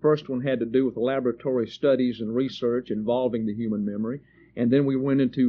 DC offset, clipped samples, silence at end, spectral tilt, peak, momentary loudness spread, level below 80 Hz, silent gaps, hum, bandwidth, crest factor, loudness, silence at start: under 0.1%; under 0.1%; 0 s; -6.5 dB/octave; -10 dBFS; 6 LU; -62 dBFS; none; none; 6.6 kHz; 14 dB; -25 LUFS; 0 s